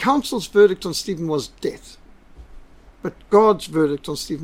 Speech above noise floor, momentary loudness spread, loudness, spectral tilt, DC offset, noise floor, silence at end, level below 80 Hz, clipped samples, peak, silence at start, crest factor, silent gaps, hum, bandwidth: 24 dB; 17 LU; -20 LUFS; -5 dB/octave; under 0.1%; -44 dBFS; 0 s; -48 dBFS; under 0.1%; -2 dBFS; 0 s; 18 dB; none; none; 16 kHz